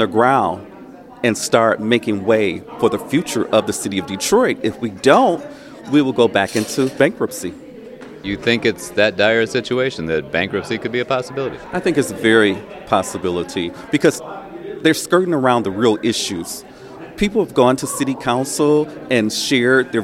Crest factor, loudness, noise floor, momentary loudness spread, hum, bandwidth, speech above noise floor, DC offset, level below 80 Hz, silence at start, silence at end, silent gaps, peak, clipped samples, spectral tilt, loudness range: 18 dB; -17 LUFS; -38 dBFS; 14 LU; none; 16.5 kHz; 21 dB; under 0.1%; -50 dBFS; 0 s; 0 s; none; 0 dBFS; under 0.1%; -4.5 dB/octave; 2 LU